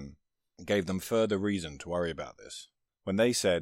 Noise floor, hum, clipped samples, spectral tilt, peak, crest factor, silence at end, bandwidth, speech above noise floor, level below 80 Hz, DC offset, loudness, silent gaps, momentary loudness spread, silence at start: -60 dBFS; none; under 0.1%; -4.5 dB/octave; -16 dBFS; 16 dB; 0 s; 16 kHz; 29 dB; -60 dBFS; under 0.1%; -31 LUFS; none; 18 LU; 0 s